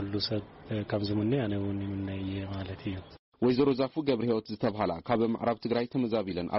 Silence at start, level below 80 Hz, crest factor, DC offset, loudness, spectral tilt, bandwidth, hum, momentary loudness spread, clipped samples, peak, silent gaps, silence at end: 0 s; -58 dBFS; 14 dB; under 0.1%; -31 LUFS; -6 dB/octave; 5.8 kHz; none; 10 LU; under 0.1%; -16 dBFS; 3.19-3.32 s; 0 s